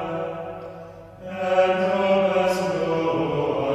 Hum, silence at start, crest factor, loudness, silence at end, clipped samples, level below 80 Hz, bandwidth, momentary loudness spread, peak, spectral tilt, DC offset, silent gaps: none; 0 s; 16 dB; -22 LUFS; 0 s; under 0.1%; -56 dBFS; 13.5 kHz; 18 LU; -6 dBFS; -6 dB/octave; under 0.1%; none